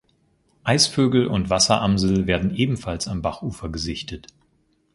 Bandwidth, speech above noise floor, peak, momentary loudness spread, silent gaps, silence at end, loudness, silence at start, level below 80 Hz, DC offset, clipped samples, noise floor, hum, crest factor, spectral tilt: 11.5 kHz; 43 dB; -2 dBFS; 13 LU; none; 0.75 s; -21 LUFS; 0.65 s; -40 dBFS; under 0.1%; under 0.1%; -65 dBFS; none; 20 dB; -4.5 dB/octave